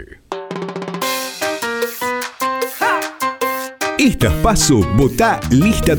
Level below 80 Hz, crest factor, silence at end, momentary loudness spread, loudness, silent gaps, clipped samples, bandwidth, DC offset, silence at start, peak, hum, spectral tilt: -30 dBFS; 14 dB; 0 s; 12 LU; -17 LUFS; none; under 0.1%; over 20 kHz; under 0.1%; 0 s; -2 dBFS; none; -4.5 dB/octave